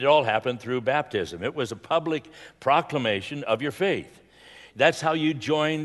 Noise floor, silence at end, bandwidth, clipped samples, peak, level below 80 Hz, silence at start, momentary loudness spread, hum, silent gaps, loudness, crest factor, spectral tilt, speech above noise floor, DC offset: -50 dBFS; 0 s; 12 kHz; under 0.1%; -4 dBFS; -64 dBFS; 0 s; 9 LU; none; none; -25 LUFS; 22 dB; -5 dB/octave; 25 dB; under 0.1%